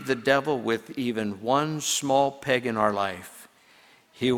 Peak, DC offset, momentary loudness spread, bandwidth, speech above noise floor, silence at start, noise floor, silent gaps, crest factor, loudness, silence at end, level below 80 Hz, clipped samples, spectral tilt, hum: -6 dBFS; under 0.1%; 7 LU; 19 kHz; 31 dB; 0 s; -57 dBFS; none; 22 dB; -25 LUFS; 0 s; -64 dBFS; under 0.1%; -4 dB/octave; none